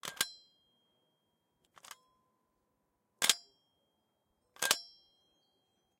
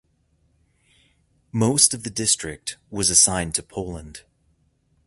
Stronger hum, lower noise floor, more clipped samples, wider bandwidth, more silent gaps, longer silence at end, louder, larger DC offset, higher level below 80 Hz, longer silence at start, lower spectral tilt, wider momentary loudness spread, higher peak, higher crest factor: neither; first, -81 dBFS vs -65 dBFS; neither; first, 16.5 kHz vs 12 kHz; neither; first, 1.15 s vs 0.85 s; second, -33 LUFS vs -19 LUFS; neither; second, -86 dBFS vs -48 dBFS; second, 0.05 s vs 1.55 s; second, 1.5 dB/octave vs -2.5 dB/octave; first, 24 LU vs 18 LU; second, -6 dBFS vs 0 dBFS; first, 36 dB vs 24 dB